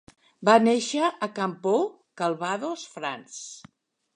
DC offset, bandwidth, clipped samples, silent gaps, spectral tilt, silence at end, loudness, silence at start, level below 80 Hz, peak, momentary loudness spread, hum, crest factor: under 0.1%; 10.5 kHz; under 0.1%; none; -4 dB/octave; 0.6 s; -25 LUFS; 0.4 s; -76 dBFS; -4 dBFS; 19 LU; none; 22 dB